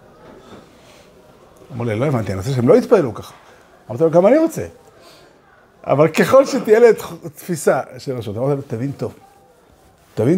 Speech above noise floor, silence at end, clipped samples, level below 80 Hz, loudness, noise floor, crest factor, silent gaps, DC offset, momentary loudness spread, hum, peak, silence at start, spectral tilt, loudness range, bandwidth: 35 dB; 0 s; under 0.1%; -56 dBFS; -16 LUFS; -50 dBFS; 18 dB; none; under 0.1%; 19 LU; none; 0 dBFS; 0.3 s; -6.5 dB/octave; 4 LU; 16 kHz